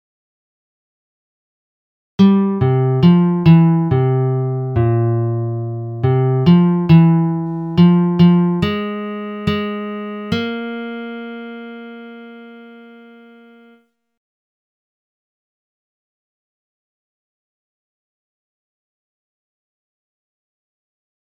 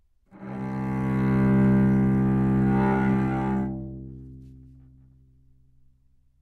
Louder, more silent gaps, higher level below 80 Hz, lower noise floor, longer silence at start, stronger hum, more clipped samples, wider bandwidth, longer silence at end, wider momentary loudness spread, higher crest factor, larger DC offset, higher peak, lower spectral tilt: first, -15 LUFS vs -23 LUFS; neither; second, -48 dBFS vs -42 dBFS; second, -53 dBFS vs -61 dBFS; first, 2.2 s vs 0.35 s; neither; neither; first, 5.6 kHz vs 4.3 kHz; first, 8.45 s vs 1.9 s; about the same, 19 LU vs 20 LU; about the same, 18 dB vs 14 dB; neither; first, 0 dBFS vs -12 dBFS; about the same, -10 dB/octave vs -10.5 dB/octave